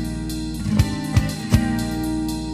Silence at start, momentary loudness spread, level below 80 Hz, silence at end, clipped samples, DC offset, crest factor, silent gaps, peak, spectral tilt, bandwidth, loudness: 0 s; 7 LU; -30 dBFS; 0 s; under 0.1%; under 0.1%; 20 dB; none; -2 dBFS; -6 dB/octave; 15.5 kHz; -22 LUFS